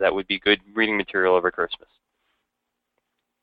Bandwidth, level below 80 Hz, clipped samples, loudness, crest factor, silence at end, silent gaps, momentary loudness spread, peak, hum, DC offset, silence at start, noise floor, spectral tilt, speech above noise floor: 5 kHz; -58 dBFS; under 0.1%; -22 LUFS; 20 dB; 1.65 s; none; 8 LU; -6 dBFS; none; under 0.1%; 0 s; -80 dBFS; -7.5 dB/octave; 58 dB